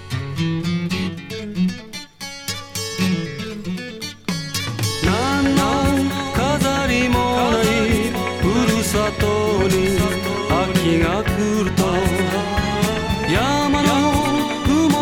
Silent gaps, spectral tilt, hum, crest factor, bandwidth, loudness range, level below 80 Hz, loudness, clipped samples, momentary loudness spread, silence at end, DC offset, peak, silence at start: none; -5 dB/octave; none; 16 dB; 19 kHz; 7 LU; -34 dBFS; -19 LUFS; under 0.1%; 10 LU; 0 s; under 0.1%; -2 dBFS; 0 s